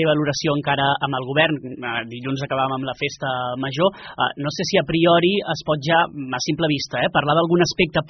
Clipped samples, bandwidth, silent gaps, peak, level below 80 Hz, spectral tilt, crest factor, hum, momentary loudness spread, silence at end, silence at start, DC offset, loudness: under 0.1%; 6.4 kHz; none; -4 dBFS; -52 dBFS; -3.5 dB/octave; 16 dB; none; 8 LU; 0 s; 0 s; under 0.1%; -20 LUFS